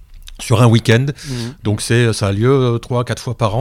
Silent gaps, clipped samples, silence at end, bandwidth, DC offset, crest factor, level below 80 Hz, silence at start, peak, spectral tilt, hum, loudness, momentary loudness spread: none; under 0.1%; 0 s; 14 kHz; under 0.1%; 14 dB; -38 dBFS; 0 s; 0 dBFS; -6 dB/octave; none; -15 LUFS; 11 LU